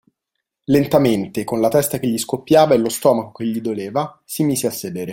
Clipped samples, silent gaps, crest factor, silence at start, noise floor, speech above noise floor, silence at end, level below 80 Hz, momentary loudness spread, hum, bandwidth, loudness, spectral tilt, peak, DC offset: under 0.1%; none; 16 dB; 0.7 s; -79 dBFS; 61 dB; 0 s; -54 dBFS; 10 LU; none; 17 kHz; -18 LUFS; -5.5 dB/octave; -2 dBFS; under 0.1%